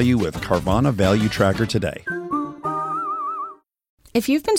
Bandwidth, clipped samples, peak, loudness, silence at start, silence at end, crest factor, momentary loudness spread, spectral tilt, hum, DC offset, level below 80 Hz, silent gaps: 16.5 kHz; under 0.1%; -4 dBFS; -22 LUFS; 0 s; 0 s; 18 dB; 8 LU; -6 dB/octave; none; under 0.1%; -42 dBFS; 3.89-3.97 s